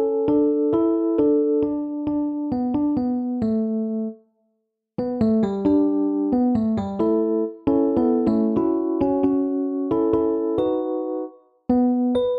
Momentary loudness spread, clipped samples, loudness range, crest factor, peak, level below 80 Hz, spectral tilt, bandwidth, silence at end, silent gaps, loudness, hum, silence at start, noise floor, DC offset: 7 LU; under 0.1%; 3 LU; 14 dB; -8 dBFS; -52 dBFS; -10 dB/octave; 4.9 kHz; 0 s; none; -22 LUFS; none; 0 s; -74 dBFS; under 0.1%